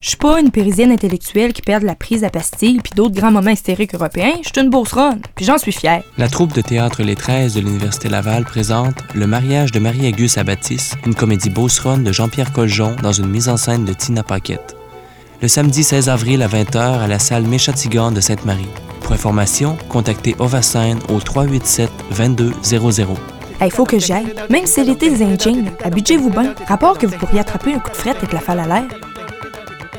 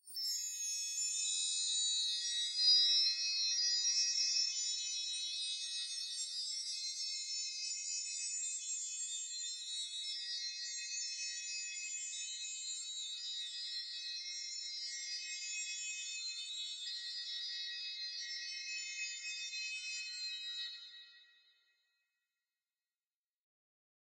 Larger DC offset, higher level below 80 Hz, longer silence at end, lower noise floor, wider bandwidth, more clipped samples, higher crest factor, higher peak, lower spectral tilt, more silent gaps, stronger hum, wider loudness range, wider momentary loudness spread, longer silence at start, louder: neither; first, -32 dBFS vs under -90 dBFS; second, 0 s vs 2.85 s; second, -38 dBFS vs under -90 dBFS; first, 19 kHz vs 16 kHz; neither; second, 14 dB vs 20 dB; first, 0 dBFS vs -20 dBFS; first, -5 dB/octave vs 11 dB/octave; neither; neither; second, 2 LU vs 11 LU; second, 7 LU vs 10 LU; about the same, 0 s vs 0.05 s; first, -15 LUFS vs -37 LUFS